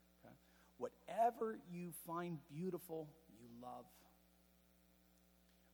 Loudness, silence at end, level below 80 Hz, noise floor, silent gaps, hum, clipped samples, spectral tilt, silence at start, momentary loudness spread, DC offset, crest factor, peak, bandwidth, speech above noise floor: -46 LUFS; 1.65 s; -80 dBFS; -73 dBFS; none; none; under 0.1%; -6.5 dB/octave; 0.25 s; 25 LU; under 0.1%; 22 dB; -26 dBFS; 19.5 kHz; 24 dB